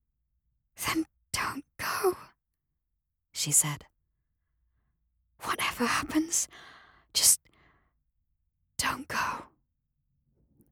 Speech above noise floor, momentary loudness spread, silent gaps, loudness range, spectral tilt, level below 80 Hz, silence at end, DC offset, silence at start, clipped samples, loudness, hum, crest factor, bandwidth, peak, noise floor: 55 dB; 16 LU; none; 6 LU; -1.5 dB/octave; -62 dBFS; 1.25 s; under 0.1%; 0.8 s; under 0.1%; -28 LUFS; none; 26 dB; 19.5 kHz; -6 dBFS; -83 dBFS